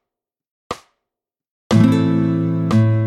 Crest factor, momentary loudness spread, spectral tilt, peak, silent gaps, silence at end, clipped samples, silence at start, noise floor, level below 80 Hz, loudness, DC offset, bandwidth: 16 dB; 18 LU; -8 dB/octave; -2 dBFS; 1.50-1.70 s; 0 s; under 0.1%; 0.7 s; -85 dBFS; -54 dBFS; -16 LUFS; under 0.1%; 11 kHz